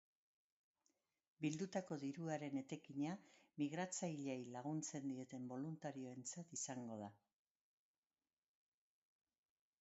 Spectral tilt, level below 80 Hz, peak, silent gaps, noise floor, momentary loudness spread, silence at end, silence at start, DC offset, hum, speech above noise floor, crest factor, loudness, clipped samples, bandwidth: -6 dB/octave; under -90 dBFS; -30 dBFS; none; under -90 dBFS; 6 LU; 2.65 s; 1.4 s; under 0.1%; none; over 42 dB; 20 dB; -48 LUFS; under 0.1%; 7.6 kHz